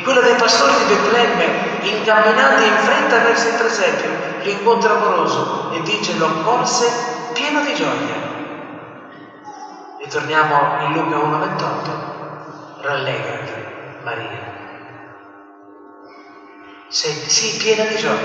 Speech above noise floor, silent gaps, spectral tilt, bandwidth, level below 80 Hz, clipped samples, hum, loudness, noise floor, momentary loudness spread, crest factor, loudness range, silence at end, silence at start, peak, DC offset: 25 dB; none; -3 dB/octave; 9 kHz; -64 dBFS; under 0.1%; none; -16 LUFS; -42 dBFS; 21 LU; 16 dB; 13 LU; 0 s; 0 s; -2 dBFS; under 0.1%